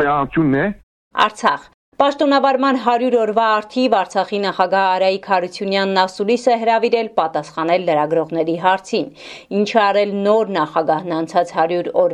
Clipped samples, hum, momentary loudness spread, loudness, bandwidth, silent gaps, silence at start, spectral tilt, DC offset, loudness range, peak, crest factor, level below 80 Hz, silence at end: under 0.1%; none; 6 LU; -17 LUFS; 10.5 kHz; 0.83-1.11 s, 1.74-1.92 s; 0 s; -5.5 dB/octave; under 0.1%; 2 LU; 0 dBFS; 16 dB; -54 dBFS; 0 s